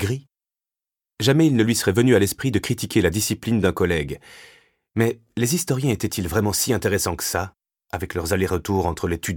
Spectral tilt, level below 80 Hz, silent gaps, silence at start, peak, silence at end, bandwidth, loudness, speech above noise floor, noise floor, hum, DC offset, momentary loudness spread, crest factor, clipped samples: -5 dB/octave; -44 dBFS; none; 0 s; -4 dBFS; 0 s; 19 kHz; -21 LUFS; 69 dB; -90 dBFS; none; under 0.1%; 10 LU; 18 dB; under 0.1%